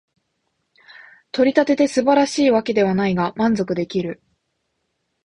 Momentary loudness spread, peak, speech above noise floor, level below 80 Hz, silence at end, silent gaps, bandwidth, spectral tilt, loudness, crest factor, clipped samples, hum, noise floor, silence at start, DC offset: 9 LU; -2 dBFS; 55 dB; -58 dBFS; 1.1 s; none; 11 kHz; -5.5 dB/octave; -18 LUFS; 18 dB; under 0.1%; none; -73 dBFS; 1.35 s; under 0.1%